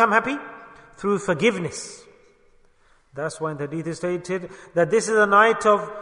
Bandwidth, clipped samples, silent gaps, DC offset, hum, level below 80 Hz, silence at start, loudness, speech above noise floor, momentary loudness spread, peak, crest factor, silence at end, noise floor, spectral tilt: 10.5 kHz; under 0.1%; none; under 0.1%; none; -60 dBFS; 0 s; -22 LUFS; 36 dB; 17 LU; -2 dBFS; 20 dB; 0 s; -57 dBFS; -4.5 dB/octave